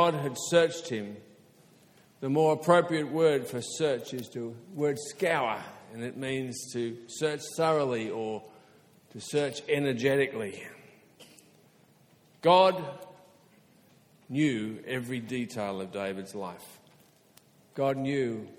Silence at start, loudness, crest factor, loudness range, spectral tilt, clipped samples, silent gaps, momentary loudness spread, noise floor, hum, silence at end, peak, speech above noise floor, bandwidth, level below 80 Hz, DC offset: 0 s; -29 LUFS; 22 dB; 6 LU; -5 dB/octave; under 0.1%; none; 16 LU; -62 dBFS; none; 0.05 s; -8 dBFS; 33 dB; 17.5 kHz; -72 dBFS; under 0.1%